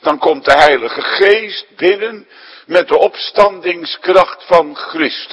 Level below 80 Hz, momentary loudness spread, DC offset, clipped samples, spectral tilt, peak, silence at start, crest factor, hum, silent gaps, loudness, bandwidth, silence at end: -48 dBFS; 9 LU; under 0.1%; 0.8%; -4 dB/octave; 0 dBFS; 0.05 s; 12 dB; none; none; -12 LUFS; 11 kHz; 0 s